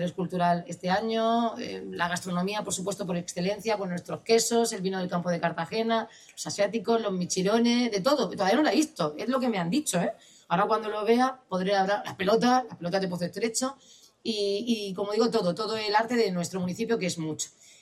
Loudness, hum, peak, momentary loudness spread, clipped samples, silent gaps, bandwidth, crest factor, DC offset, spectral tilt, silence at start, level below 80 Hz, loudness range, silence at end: -27 LUFS; none; -10 dBFS; 8 LU; under 0.1%; none; 15.5 kHz; 18 dB; under 0.1%; -4.5 dB/octave; 0 s; -70 dBFS; 3 LU; 0.3 s